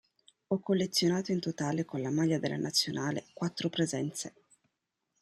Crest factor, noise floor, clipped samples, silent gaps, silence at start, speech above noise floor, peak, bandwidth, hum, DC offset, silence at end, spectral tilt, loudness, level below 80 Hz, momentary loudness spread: 18 dB; -84 dBFS; under 0.1%; none; 0.5 s; 52 dB; -16 dBFS; 15 kHz; none; under 0.1%; 0.9 s; -4.5 dB/octave; -32 LUFS; -74 dBFS; 7 LU